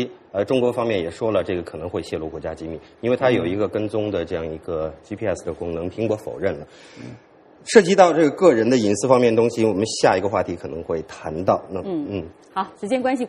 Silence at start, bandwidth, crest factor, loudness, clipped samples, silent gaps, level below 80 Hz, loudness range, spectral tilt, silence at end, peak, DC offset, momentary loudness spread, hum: 0 s; 11.5 kHz; 20 dB; -21 LUFS; under 0.1%; none; -52 dBFS; 9 LU; -5.5 dB/octave; 0 s; 0 dBFS; under 0.1%; 15 LU; none